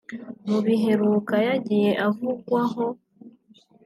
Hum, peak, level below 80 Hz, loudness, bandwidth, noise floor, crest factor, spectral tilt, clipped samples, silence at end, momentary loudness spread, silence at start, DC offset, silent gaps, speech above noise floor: none; -10 dBFS; -74 dBFS; -23 LUFS; 13 kHz; -56 dBFS; 14 dB; -7.5 dB/octave; under 0.1%; 0.55 s; 10 LU; 0.1 s; under 0.1%; none; 34 dB